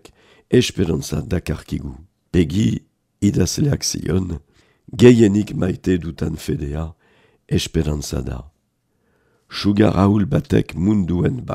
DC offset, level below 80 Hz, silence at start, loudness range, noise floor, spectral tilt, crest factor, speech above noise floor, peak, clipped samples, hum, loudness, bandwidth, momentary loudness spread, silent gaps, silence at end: under 0.1%; -38 dBFS; 0.5 s; 7 LU; -67 dBFS; -6 dB/octave; 20 dB; 49 dB; 0 dBFS; under 0.1%; none; -19 LUFS; 15.5 kHz; 14 LU; none; 0 s